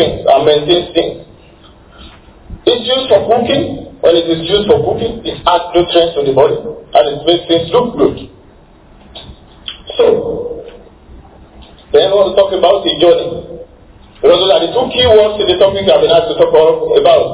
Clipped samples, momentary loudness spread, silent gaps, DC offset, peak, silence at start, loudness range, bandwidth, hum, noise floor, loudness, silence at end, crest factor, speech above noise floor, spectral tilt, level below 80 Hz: 0.9%; 13 LU; none; under 0.1%; 0 dBFS; 0 s; 6 LU; 4 kHz; none; -41 dBFS; -11 LUFS; 0 s; 12 dB; 31 dB; -9.5 dB/octave; -38 dBFS